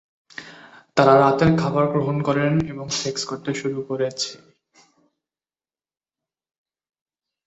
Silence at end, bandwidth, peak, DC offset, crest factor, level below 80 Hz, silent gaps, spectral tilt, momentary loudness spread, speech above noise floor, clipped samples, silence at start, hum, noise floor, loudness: 3.1 s; 8.2 kHz; -2 dBFS; under 0.1%; 20 dB; -52 dBFS; none; -5.5 dB/octave; 14 LU; over 70 dB; under 0.1%; 0.4 s; none; under -90 dBFS; -21 LUFS